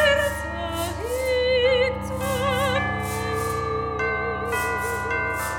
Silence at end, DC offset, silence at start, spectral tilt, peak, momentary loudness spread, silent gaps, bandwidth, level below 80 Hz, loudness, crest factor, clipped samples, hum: 0 s; under 0.1%; 0 s; -4 dB/octave; -8 dBFS; 8 LU; none; 19 kHz; -38 dBFS; -24 LUFS; 16 dB; under 0.1%; none